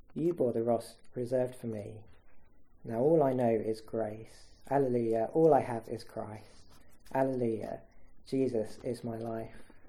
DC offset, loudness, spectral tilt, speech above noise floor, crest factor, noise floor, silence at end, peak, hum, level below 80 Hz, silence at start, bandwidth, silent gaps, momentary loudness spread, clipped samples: under 0.1%; -32 LUFS; -8 dB/octave; 20 dB; 20 dB; -51 dBFS; 0 s; -12 dBFS; none; -62 dBFS; 0.1 s; 14.5 kHz; none; 16 LU; under 0.1%